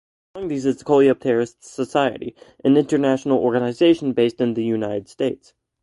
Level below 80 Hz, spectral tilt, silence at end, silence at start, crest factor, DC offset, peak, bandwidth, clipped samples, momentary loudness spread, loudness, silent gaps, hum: -60 dBFS; -6.5 dB/octave; 0.5 s; 0.35 s; 16 dB; under 0.1%; -4 dBFS; 11.5 kHz; under 0.1%; 12 LU; -20 LUFS; none; none